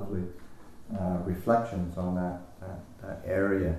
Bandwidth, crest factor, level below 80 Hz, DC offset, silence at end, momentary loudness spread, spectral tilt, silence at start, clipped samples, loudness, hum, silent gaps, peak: 13.5 kHz; 20 dB; -48 dBFS; under 0.1%; 0 s; 16 LU; -9 dB/octave; 0 s; under 0.1%; -31 LUFS; none; none; -12 dBFS